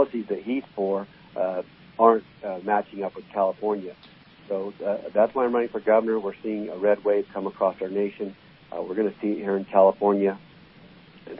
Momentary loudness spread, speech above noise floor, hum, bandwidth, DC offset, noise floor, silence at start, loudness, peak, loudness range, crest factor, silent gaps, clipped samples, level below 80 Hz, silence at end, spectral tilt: 14 LU; 26 dB; none; 5.6 kHz; under 0.1%; -50 dBFS; 0 s; -25 LUFS; -4 dBFS; 3 LU; 22 dB; none; under 0.1%; -68 dBFS; 0 s; -11 dB/octave